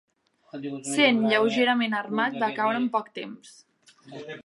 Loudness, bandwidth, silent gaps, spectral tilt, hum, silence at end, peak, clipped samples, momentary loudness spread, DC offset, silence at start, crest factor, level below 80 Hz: -24 LUFS; 11.5 kHz; none; -3.5 dB/octave; none; 0.05 s; -8 dBFS; under 0.1%; 21 LU; under 0.1%; 0.55 s; 18 dB; -82 dBFS